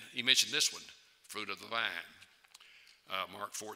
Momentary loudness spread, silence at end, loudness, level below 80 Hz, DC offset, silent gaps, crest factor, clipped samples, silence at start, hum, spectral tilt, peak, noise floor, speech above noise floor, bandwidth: 20 LU; 0 s; -33 LUFS; -86 dBFS; under 0.1%; none; 28 dB; under 0.1%; 0 s; none; 0.5 dB/octave; -10 dBFS; -61 dBFS; 25 dB; 16 kHz